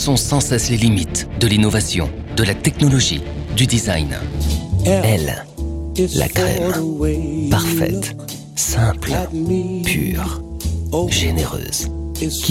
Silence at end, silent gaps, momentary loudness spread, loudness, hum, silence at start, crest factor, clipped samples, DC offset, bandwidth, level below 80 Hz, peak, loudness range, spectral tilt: 0 s; none; 9 LU; -18 LUFS; none; 0 s; 18 dB; under 0.1%; under 0.1%; 16.5 kHz; -28 dBFS; 0 dBFS; 3 LU; -4.5 dB/octave